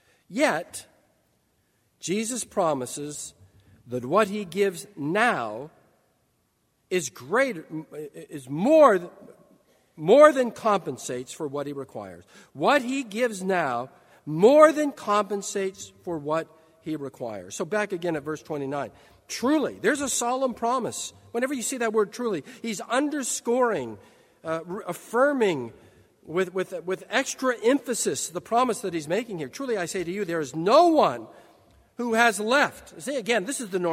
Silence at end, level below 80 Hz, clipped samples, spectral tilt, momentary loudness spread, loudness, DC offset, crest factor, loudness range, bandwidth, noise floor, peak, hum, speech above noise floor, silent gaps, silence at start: 0 s; -70 dBFS; under 0.1%; -4 dB/octave; 17 LU; -25 LUFS; under 0.1%; 24 dB; 7 LU; 16 kHz; -70 dBFS; -2 dBFS; none; 45 dB; none; 0.3 s